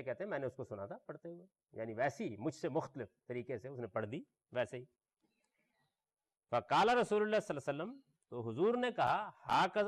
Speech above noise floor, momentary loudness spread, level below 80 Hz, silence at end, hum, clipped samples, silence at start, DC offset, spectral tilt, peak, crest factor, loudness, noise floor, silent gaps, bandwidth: over 52 dB; 17 LU; -78 dBFS; 0 s; none; under 0.1%; 0 s; under 0.1%; -5.5 dB/octave; -24 dBFS; 14 dB; -38 LUFS; under -90 dBFS; none; 13 kHz